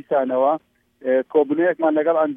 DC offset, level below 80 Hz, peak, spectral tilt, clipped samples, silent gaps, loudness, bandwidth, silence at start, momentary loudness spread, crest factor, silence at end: under 0.1%; -76 dBFS; -6 dBFS; -9 dB/octave; under 0.1%; none; -20 LUFS; 3.7 kHz; 0.1 s; 5 LU; 14 dB; 0 s